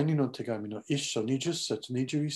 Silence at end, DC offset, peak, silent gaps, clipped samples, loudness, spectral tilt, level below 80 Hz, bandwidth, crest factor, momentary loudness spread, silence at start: 0 s; under 0.1%; -16 dBFS; none; under 0.1%; -32 LUFS; -5 dB/octave; -72 dBFS; 12.5 kHz; 16 dB; 5 LU; 0 s